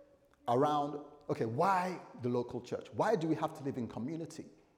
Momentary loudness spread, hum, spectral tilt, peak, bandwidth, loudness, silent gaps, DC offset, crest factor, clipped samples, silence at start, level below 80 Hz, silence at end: 12 LU; none; -7 dB/octave; -18 dBFS; 16.5 kHz; -35 LUFS; none; under 0.1%; 18 dB; under 0.1%; 0 s; -74 dBFS; 0.3 s